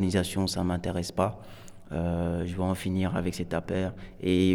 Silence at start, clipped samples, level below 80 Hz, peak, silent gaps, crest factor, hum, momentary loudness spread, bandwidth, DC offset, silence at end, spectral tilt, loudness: 0 s; under 0.1%; -48 dBFS; -10 dBFS; none; 18 dB; none; 8 LU; 17.5 kHz; under 0.1%; 0 s; -6 dB/octave; -30 LUFS